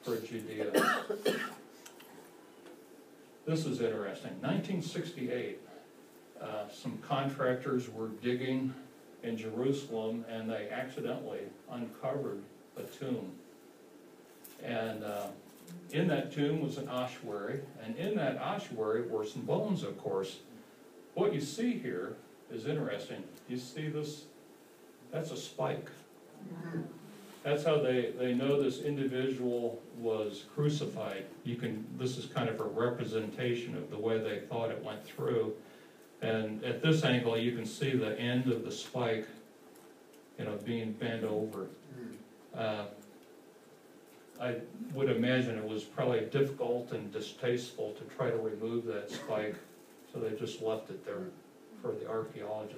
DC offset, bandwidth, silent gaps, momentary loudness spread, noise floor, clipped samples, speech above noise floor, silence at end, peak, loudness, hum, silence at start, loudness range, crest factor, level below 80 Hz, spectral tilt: under 0.1%; 15.5 kHz; none; 20 LU; -58 dBFS; under 0.1%; 23 dB; 0 s; -14 dBFS; -36 LUFS; none; 0 s; 8 LU; 22 dB; -82 dBFS; -6 dB/octave